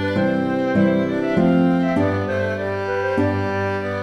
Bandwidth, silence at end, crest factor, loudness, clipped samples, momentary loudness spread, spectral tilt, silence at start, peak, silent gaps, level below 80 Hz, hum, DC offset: 9.8 kHz; 0 s; 14 dB; -20 LUFS; under 0.1%; 6 LU; -8 dB/octave; 0 s; -6 dBFS; none; -52 dBFS; none; under 0.1%